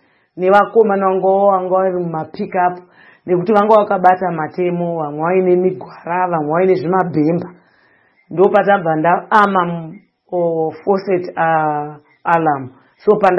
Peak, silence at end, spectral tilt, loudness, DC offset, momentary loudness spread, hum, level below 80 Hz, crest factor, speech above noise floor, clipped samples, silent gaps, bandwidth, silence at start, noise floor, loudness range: 0 dBFS; 0 s; -9 dB/octave; -15 LUFS; under 0.1%; 12 LU; none; -62 dBFS; 16 dB; 40 dB; 0.1%; none; 6.2 kHz; 0.35 s; -54 dBFS; 2 LU